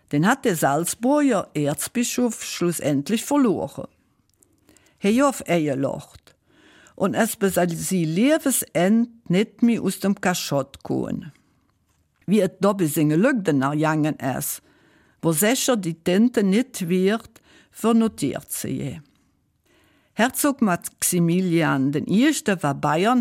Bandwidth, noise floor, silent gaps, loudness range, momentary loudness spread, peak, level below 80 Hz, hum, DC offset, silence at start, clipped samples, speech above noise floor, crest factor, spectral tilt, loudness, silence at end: 16.5 kHz; -66 dBFS; none; 4 LU; 8 LU; -6 dBFS; -60 dBFS; none; under 0.1%; 0.1 s; under 0.1%; 45 dB; 16 dB; -5 dB/octave; -22 LUFS; 0 s